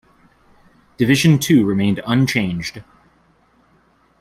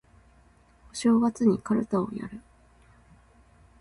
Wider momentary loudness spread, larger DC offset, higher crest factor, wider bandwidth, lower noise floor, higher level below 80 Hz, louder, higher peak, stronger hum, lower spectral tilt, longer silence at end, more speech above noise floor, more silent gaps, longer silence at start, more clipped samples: second, 10 LU vs 18 LU; neither; about the same, 16 dB vs 18 dB; first, 16 kHz vs 11.5 kHz; about the same, -57 dBFS vs -59 dBFS; first, -52 dBFS vs -58 dBFS; first, -16 LUFS vs -26 LUFS; first, -2 dBFS vs -10 dBFS; neither; about the same, -5.5 dB/octave vs -6.5 dB/octave; about the same, 1.4 s vs 1.4 s; first, 41 dB vs 34 dB; neither; about the same, 1 s vs 0.95 s; neither